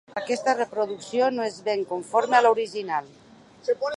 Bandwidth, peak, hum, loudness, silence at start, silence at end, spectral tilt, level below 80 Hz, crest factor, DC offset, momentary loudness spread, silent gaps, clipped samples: 11.5 kHz; -6 dBFS; none; -25 LUFS; 0.15 s; 0.05 s; -3.5 dB/octave; -74 dBFS; 20 dB; under 0.1%; 10 LU; none; under 0.1%